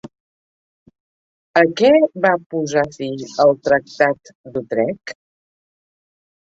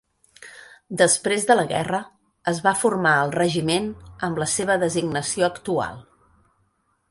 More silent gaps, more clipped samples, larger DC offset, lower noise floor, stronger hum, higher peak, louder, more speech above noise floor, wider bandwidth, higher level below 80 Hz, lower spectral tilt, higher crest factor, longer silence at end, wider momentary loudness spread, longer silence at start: first, 0.20-0.86 s, 1.00-1.54 s, 2.46-2.50 s, 4.35-4.44 s vs none; neither; neither; first, under -90 dBFS vs -68 dBFS; neither; about the same, -2 dBFS vs -2 dBFS; first, -17 LUFS vs -22 LUFS; first, over 73 dB vs 46 dB; second, 7.8 kHz vs 12 kHz; about the same, -60 dBFS vs -56 dBFS; first, -5.5 dB/octave vs -3.5 dB/octave; about the same, 18 dB vs 20 dB; first, 1.45 s vs 1.1 s; about the same, 15 LU vs 13 LU; second, 0.05 s vs 0.4 s